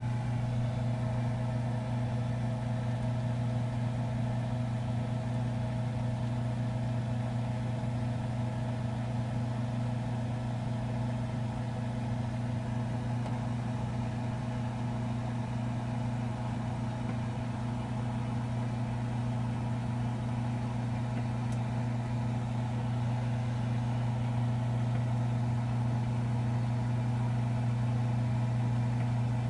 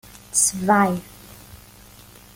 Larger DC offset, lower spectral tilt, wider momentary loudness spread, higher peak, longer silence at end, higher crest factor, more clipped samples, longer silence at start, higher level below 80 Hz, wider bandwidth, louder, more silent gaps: neither; first, -8 dB/octave vs -3.5 dB/octave; about the same, 4 LU vs 6 LU; second, -20 dBFS vs -6 dBFS; second, 0 s vs 0.8 s; second, 12 dB vs 18 dB; neither; second, 0 s vs 0.15 s; about the same, -50 dBFS vs -52 dBFS; second, 10.5 kHz vs 17 kHz; second, -33 LUFS vs -19 LUFS; neither